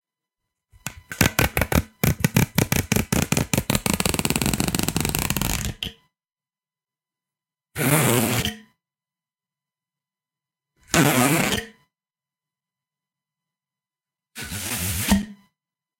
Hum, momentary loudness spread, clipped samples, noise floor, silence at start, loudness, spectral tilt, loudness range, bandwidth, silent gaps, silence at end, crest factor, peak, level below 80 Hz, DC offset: none; 15 LU; under 0.1%; under -90 dBFS; 0.85 s; -22 LUFS; -4 dB/octave; 7 LU; 17 kHz; none; 0.65 s; 26 dB; 0 dBFS; -40 dBFS; under 0.1%